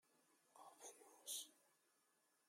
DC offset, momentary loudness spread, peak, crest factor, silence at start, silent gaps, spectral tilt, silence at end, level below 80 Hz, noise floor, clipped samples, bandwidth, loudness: under 0.1%; 15 LU; -36 dBFS; 26 dB; 0.05 s; none; 2 dB/octave; 0.55 s; under -90 dBFS; -83 dBFS; under 0.1%; 16 kHz; -54 LUFS